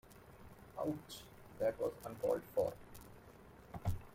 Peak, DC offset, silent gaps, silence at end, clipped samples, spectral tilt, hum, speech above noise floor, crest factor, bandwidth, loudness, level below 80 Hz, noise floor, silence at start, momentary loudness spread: -24 dBFS; under 0.1%; none; 0 s; under 0.1%; -6.5 dB/octave; none; 20 dB; 20 dB; 16.5 kHz; -41 LUFS; -58 dBFS; -59 dBFS; 0.05 s; 21 LU